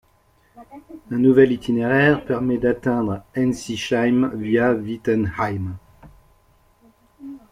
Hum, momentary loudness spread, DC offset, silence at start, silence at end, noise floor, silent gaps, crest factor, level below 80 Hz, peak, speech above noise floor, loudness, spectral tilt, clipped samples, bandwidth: none; 13 LU; under 0.1%; 0.55 s; 0.15 s; -59 dBFS; none; 20 dB; -50 dBFS; -2 dBFS; 39 dB; -20 LUFS; -7 dB/octave; under 0.1%; 12 kHz